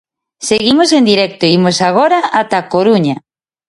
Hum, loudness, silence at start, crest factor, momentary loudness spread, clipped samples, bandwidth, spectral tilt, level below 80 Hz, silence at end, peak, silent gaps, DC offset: none; -11 LUFS; 0.4 s; 12 dB; 7 LU; under 0.1%; 11.5 kHz; -4.5 dB/octave; -52 dBFS; 0.5 s; 0 dBFS; none; under 0.1%